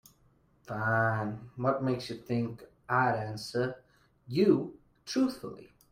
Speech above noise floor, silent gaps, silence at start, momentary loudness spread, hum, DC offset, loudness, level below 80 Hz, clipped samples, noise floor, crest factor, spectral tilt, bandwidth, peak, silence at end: 36 dB; none; 0.65 s; 17 LU; none; under 0.1%; -31 LUFS; -66 dBFS; under 0.1%; -66 dBFS; 20 dB; -6.5 dB/octave; 16 kHz; -12 dBFS; 0.25 s